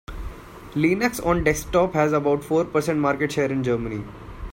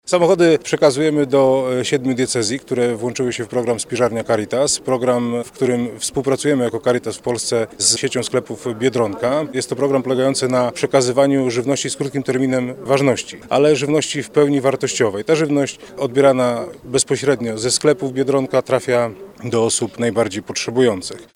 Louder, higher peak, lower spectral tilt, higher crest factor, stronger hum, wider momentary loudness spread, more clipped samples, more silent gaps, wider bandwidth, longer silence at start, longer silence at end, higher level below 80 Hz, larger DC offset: second, -22 LUFS vs -18 LUFS; second, -4 dBFS vs 0 dBFS; first, -6 dB/octave vs -4.5 dB/octave; about the same, 18 dB vs 18 dB; neither; first, 17 LU vs 7 LU; neither; neither; about the same, 16.5 kHz vs 16 kHz; about the same, 0.1 s vs 0.05 s; about the same, 0 s vs 0.1 s; first, -40 dBFS vs -56 dBFS; neither